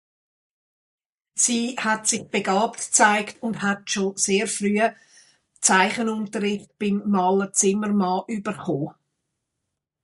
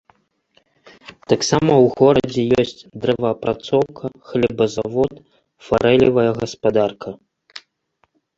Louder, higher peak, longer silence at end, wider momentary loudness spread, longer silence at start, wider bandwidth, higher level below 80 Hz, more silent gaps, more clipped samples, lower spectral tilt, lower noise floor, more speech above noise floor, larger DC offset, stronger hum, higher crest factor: second, -22 LUFS vs -18 LUFS; about the same, -2 dBFS vs -2 dBFS; first, 1.1 s vs 0.8 s; second, 10 LU vs 19 LU; about the same, 1.35 s vs 1.3 s; first, 11.5 kHz vs 8 kHz; second, -68 dBFS vs -50 dBFS; neither; neither; second, -3 dB/octave vs -5.5 dB/octave; first, -81 dBFS vs -65 dBFS; first, 59 dB vs 48 dB; neither; neither; about the same, 22 dB vs 18 dB